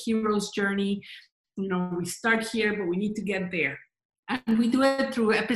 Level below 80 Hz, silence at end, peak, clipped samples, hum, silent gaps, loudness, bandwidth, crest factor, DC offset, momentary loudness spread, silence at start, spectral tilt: -64 dBFS; 0 s; -10 dBFS; under 0.1%; none; 1.32-1.44 s, 4.05-4.10 s, 4.19-4.23 s; -27 LUFS; 12.5 kHz; 18 dB; under 0.1%; 12 LU; 0 s; -5 dB/octave